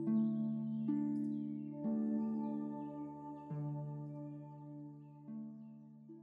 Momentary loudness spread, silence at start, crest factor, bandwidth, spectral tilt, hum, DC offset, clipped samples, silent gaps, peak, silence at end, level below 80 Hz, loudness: 15 LU; 0 s; 14 dB; 2.8 kHz; -11.5 dB/octave; none; under 0.1%; under 0.1%; none; -26 dBFS; 0 s; -82 dBFS; -41 LUFS